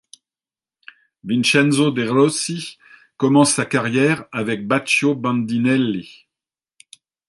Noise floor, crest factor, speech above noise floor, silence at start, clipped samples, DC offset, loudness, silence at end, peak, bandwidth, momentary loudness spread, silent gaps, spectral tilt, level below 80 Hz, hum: under -90 dBFS; 18 dB; over 72 dB; 1.25 s; under 0.1%; under 0.1%; -18 LUFS; 1.2 s; -2 dBFS; 11.5 kHz; 9 LU; none; -4.5 dB/octave; -64 dBFS; none